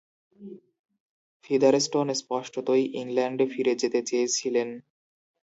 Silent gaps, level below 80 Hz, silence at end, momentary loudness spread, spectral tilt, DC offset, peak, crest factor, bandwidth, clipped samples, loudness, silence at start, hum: 0.79-0.84 s, 1.00-1.40 s; -78 dBFS; 0.8 s; 16 LU; -3.5 dB/octave; under 0.1%; -8 dBFS; 20 dB; 8 kHz; under 0.1%; -26 LUFS; 0.4 s; none